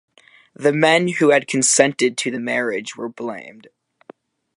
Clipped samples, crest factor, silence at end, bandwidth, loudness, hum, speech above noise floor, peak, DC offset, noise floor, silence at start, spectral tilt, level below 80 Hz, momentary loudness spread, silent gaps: under 0.1%; 20 dB; 1.05 s; 11.5 kHz; -17 LUFS; none; 29 dB; 0 dBFS; under 0.1%; -47 dBFS; 0.6 s; -3 dB/octave; -72 dBFS; 15 LU; none